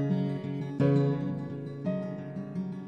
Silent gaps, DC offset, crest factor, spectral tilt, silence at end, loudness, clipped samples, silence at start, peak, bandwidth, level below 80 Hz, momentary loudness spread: none; under 0.1%; 16 dB; -10 dB/octave; 0 s; -31 LUFS; under 0.1%; 0 s; -14 dBFS; 5.8 kHz; -68 dBFS; 11 LU